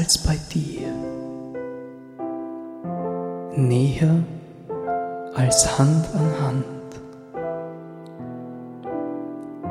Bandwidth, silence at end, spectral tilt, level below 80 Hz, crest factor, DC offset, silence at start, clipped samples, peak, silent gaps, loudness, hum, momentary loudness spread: 15 kHz; 0 s; -5 dB/octave; -42 dBFS; 22 dB; under 0.1%; 0 s; under 0.1%; -2 dBFS; none; -24 LUFS; none; 18 LU